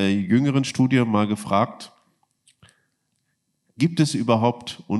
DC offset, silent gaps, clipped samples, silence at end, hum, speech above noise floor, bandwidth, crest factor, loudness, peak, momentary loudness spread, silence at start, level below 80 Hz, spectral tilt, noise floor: under 0.1%; none; under 0.1%; 0 s; none; 52 dB; 12.5 kHz; 20 dB; -21 LUFS; -4 dBFS; 8 LU; 0 s; -68 dBFS; -6.5 dB/octave; -73 dBFS